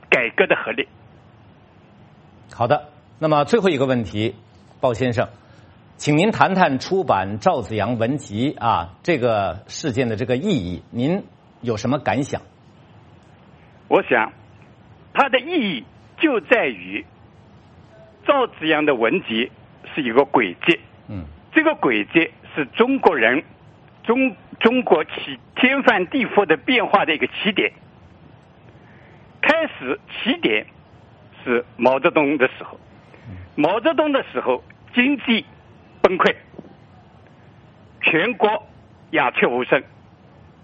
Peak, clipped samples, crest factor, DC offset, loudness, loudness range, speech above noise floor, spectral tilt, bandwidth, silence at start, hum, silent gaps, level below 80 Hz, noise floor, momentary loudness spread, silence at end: 0 dBFS; under 0.1%; 22 dB; under 0.1%; -20 LUFS; 5 LU; 30 dB; -5.5 dB/octave; 8.4 kHz; 0.1 s; none; none; -56 dBFS; -49 dBFS; 11 LU; 0.8 s